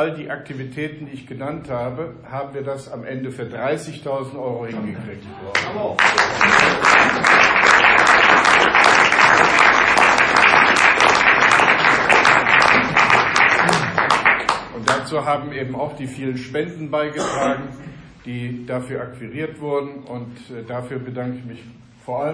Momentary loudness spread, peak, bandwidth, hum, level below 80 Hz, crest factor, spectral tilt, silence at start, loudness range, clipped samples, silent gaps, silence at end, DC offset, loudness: 19 LU; 0 dBFS; 10.5 kHz; none; -50 dBFS; 18 dB; -3 dB/octave; 0 s; 17 LU; under 0.1%; none; 0 s; under 0.1%; -14 LUFS